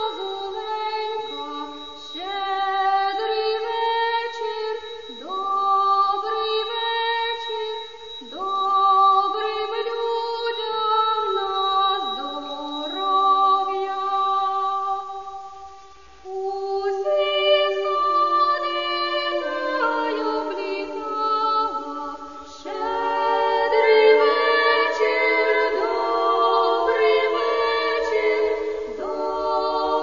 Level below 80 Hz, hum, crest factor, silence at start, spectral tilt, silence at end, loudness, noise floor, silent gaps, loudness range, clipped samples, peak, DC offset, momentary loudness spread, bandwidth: -60 dBFS; none; 18 dB; 0 s; -2.5 dB/octave; 0 s; -22 LUFS; -47 dBFS; none; 6 LU; under 0.1%; -4 dBFS; 0.4%; 13 LU; 7.4 kHz